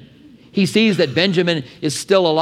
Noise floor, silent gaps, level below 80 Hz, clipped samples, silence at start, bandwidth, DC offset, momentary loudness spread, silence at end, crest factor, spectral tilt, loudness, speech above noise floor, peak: -45 dBFS; none; -60 dBFS; under 0.1%; 0.55 s; 15 kHz; under 0.1%; 8 LU; 0 s; 16 dB; -5 dB/octave; -17 LUFS; 29 dB; 0 dBFS